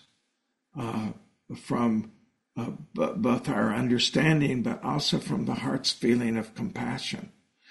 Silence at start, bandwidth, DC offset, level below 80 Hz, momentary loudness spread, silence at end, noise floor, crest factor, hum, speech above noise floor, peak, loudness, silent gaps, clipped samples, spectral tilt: 0.75 s; 11.5 kHz; under 0.1%; -60 dBFS; 14 LU; 0.45 s; -78 dBFS; 18 dB; none; 51 dB; -10 dBFS; -28 LUFS; none; under 0.1%; -5 dB/octave